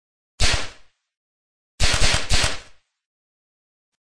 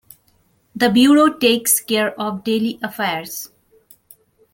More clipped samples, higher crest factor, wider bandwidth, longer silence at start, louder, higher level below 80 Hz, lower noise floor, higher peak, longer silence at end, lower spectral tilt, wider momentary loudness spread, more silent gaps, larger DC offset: neither; about the same, 20 dB vs 18 dB; second, 11 kHz vs 17 kHz; second, 0.4 s vs 0.75 s; second, -21 LUFS vs -17 LUFS; first, -30 dBFS vs -60 dBFS; second, -45 dBFS vs -60 dBFS; about the same, -4 dBFS vs -2 dBFS; second, 0.2 s vs 1.05 s; about the same, -2 dB/octave vs -3 dB/octave; second, 11 LU vs 17 LU; first, 1.17-1.78 s, 3.06-3.92 s vs none; neither